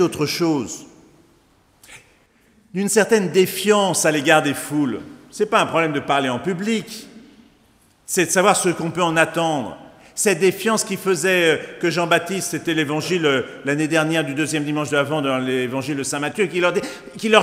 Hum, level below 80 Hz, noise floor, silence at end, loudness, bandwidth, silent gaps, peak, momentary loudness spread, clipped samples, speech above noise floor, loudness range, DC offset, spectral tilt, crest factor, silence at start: none; -62 dBFS; -57 dBFS; 0 s; -19 LUFS; 16 kHz; none; 0 dBFS; 9 LU; under 0.1%; 38 dB; 4 LU; under 0.1%; -4 dB/octave; 20 dB; 0 s